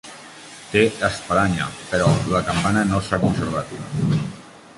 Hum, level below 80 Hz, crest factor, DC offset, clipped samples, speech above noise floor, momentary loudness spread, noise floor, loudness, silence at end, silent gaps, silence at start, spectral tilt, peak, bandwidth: none; -42 dBFS; 18 dB; under 0.1%; under 0.1%; 20 dB; 18 LU; -40 dBFS; -21 LUFS; 0.05 s; none; 0.05 s; -5.5 dB/octave; -4 dBFS; 11.5 kHz